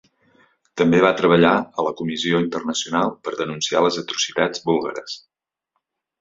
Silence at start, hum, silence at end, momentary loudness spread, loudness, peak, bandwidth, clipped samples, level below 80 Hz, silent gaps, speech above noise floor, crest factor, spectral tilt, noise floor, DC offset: 0.75 s; none; 1.05 s; 12 LU; -20 LUFS; -2 dBFS; 7.8 kHz; under 0.1%; -60 dBFS; none; 57 dB; 20 dB; -4.5 dB/octave; -77 dBFS; under 0.1%